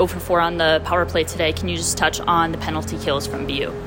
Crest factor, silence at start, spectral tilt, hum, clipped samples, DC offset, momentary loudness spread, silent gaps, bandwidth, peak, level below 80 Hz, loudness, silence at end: 16 dB; 0 s; -3.5 dB/octave; none; under 0.1%; under 0.1%; 7 LU; none; 16.5 kHz; -4 dBFS; -38 dBFS; -20 LUFS; 0 s